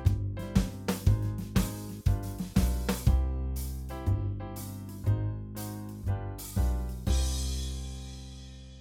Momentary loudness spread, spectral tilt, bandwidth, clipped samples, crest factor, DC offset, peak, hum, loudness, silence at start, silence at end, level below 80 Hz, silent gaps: 11 LU; -6 dB/octave; 17.5 kHz; under 0.1%; 18 dB; under 0.1%; -12 dBFS; none; -32 LUFS; 0 s; 0 s; -34 dBFS; none